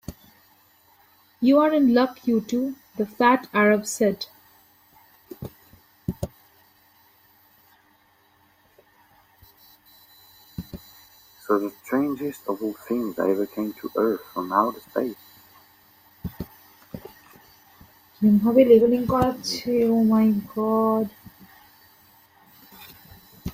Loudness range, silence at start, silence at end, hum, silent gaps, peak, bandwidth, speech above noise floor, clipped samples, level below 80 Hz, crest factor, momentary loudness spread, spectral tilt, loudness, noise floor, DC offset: 20 LU; 0.1 s; 0 s; none; none; -4 dBFS; 16 kHz; 39 dB; under 0.1%; -54 dBFS; 20 dB; 23 LU; -6 dB/octave; -22 LUFS; -61 dBFS; under 0.1%